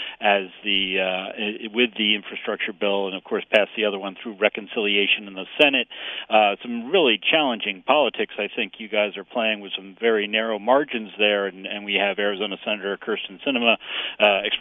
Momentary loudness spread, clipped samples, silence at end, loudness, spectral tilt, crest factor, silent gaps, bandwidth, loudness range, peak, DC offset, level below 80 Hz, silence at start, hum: 9 LU; under 0.1%; 0 s; -22 LUFS; -5.5 dB/octave; 22 dB; none; 5.4 kHz; 3 LU; -2 dBFS; under 0.1%; -68 dBFS; 0 s; none